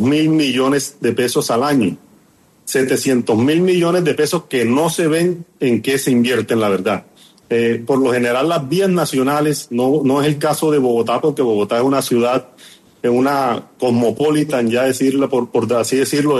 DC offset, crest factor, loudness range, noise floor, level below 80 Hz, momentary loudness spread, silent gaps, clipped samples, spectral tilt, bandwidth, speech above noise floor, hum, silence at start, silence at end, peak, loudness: under 0.1%; 12 dB; 1 LU; -52 dBFS; -58 dBFS; 4 LU; none; under 0.1%; -5 dB/octave; 13 kHz; 36 dB; none; 0 s; 0 s; -4 dBFS; -16 LUFS